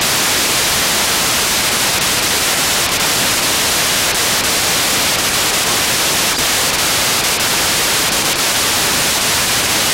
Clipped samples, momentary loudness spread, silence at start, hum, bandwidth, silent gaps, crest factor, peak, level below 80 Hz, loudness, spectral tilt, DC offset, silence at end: under 0.1%; 0 LU; 0 s; none; 16 kHz; none; 10 dB; -4 dBFS; -38 dBFS; -12 LUFS; -0.5 dB/octave; under 0.1%; 0 s